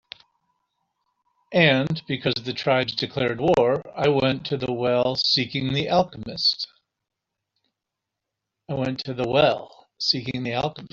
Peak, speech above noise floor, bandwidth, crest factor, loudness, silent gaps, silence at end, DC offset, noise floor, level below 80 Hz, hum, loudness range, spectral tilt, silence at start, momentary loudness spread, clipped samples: -2 dBFS; 62 dB; 7.6 kHz; 22 dB; -23 LUFS; none; 0.05 s; under 0.1%; -84 dBFS; -56 dBFS; none; 6 LU; -3 dB/octave; 1.5 s; 8 LU; under 0.1%